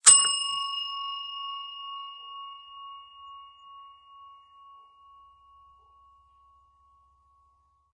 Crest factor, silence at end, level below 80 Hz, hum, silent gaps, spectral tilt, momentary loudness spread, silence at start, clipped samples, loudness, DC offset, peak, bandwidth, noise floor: 30 dB; 3.65 s; -76 dBFS; none; none; 4 dB/octave; 25 LU; 0.05 s; under 0.1%; -25 LUFS; under 0.1%; -2 dBFS; 11.5 kHz; -67 dBFS